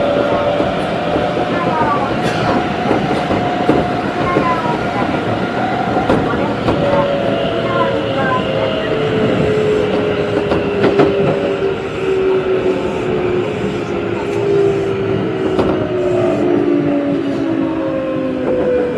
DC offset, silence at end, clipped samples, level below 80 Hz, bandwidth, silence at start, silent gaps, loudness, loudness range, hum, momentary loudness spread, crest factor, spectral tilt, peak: under 0.1%; 0 s; under 0.1%; -38 dBFS; 11.5 kHz; 0 s; none; -16 LUFS; 2 LU; none; 4 LU; 16 dB; -7 dB/octave; 0 dBFS